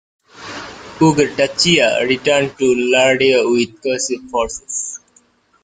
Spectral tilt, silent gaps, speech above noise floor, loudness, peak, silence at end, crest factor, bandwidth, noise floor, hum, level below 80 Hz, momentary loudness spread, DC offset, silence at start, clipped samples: -3.5 dB/octave; none; 40 dB; -15 LUFS; 0 dBFS; 0.65 s; 16 dB; 9.6 kHz; -55 dBFS; none; -50 dBFS; 18 LU; under 0.1%; 0.35 s; under 0.1%